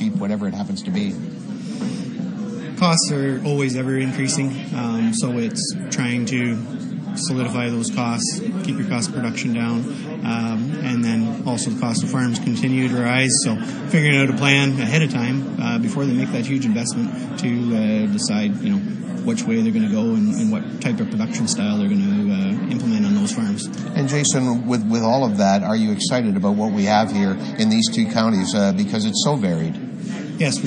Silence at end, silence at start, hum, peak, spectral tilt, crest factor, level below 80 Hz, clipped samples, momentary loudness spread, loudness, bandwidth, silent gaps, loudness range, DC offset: 0 s; 0 s; none; 0 dBFS; -5 dB/octave; 20 dB; -64 dBFS; under 0.1%; 8 LU; -20 LUFS; 10.5 kHz; none; 5 LU; under 0.1%